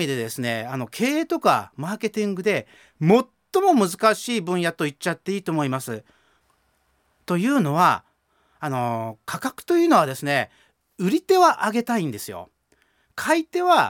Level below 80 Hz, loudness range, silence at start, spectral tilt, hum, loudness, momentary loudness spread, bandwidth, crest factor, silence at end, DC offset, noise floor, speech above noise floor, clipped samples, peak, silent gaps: -68 dBFS; 4 LU; 0 s; -5 dB/octave; none; -22 LUFS; 12 LU; 18.5 kHz; 20 dB; 0 s; under 0.1%; -66 dBFS; 45 dB; under 0.1%; -4 dBFS; none